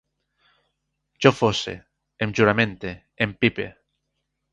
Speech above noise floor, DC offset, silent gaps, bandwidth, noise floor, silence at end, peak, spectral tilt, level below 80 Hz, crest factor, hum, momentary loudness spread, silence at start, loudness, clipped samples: 56 dB; under 0.1%; none; 9.8 kHz; -77 dBFS; 0.8 s; 0 dBFS; -5.5 dB/octave; -54 dBFS; 24 dB; none; 16 LU; 1.2 s; -22 LUFS; under 0.1%